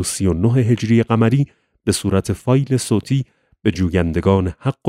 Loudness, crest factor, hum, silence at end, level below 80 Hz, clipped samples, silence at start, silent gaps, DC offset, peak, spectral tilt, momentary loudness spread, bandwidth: -18 LUFS; 16 dB; none; 0 s; -38 dBFS; under 0.1%; 0 s; none; under 0.1%; 0 dBFS; -6.5 dB/octave; 7 LU; 15.5 kHz